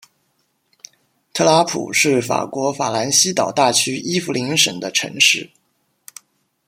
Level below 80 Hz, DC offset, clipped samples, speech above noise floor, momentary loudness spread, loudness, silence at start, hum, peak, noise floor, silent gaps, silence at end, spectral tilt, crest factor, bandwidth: -64 dBFS; under 0.1%; under 0.1%; 49 dB; 7 LU; -16 LUFS; 1.35 s; none; 0 dBFS; -66 dBFS; none; 1.25 s; -2 dB/octave; 20 dB; 16.5 kHz